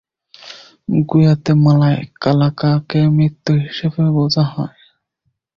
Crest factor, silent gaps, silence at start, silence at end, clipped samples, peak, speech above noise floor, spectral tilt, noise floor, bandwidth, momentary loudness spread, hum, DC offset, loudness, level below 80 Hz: 14 dB; none; 0.45 s; 0.9 s; under 0.1%; -2 dBFS; 56 dB; -8 dB/octave; -69 dBFS; 7 kHz; 15 LU; none; under 0.1%; -15 LUFS; -48 dBFS